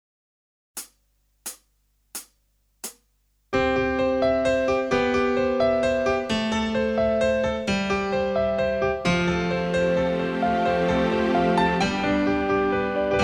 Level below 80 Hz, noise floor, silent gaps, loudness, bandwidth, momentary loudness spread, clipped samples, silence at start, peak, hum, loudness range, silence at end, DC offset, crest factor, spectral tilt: -44 dBFS; -67 dBFS; none; -23 LUFS; 19.5 kHz; 16 LU; under 0.1%; 0.75 s; -8 dBFS; 50 Hz at -65 dBFS; 7 LU; 0 s; under 0.1%; 16 dB; -5.5 dB/octave